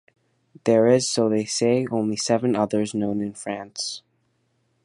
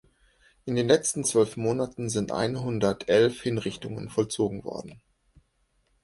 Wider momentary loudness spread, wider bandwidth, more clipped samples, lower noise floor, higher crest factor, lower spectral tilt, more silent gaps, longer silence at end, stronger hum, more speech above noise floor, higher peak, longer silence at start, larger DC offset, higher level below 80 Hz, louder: about the same, 12 LU vs 13 LU; about the same, 11.5 kHz vs 11.5 kHz; neither; about the same, -69 dBFS vs -70 dBFS; about the same, 18 dB vs 22 dB; about the same, -4.5 dB/octave vs -4.5 dB/octave; neither; second, 0.85 s vs 1.05 s; neither; about the same, 47 dB vs 44 dB; about the same, -4 dBFS vs -6 dBFS; about the same, 0.65 s vs 0.65 s; neither; second, -64 dBFS vs -58 dBFS; first, -22 LUFS vs -26 LUFS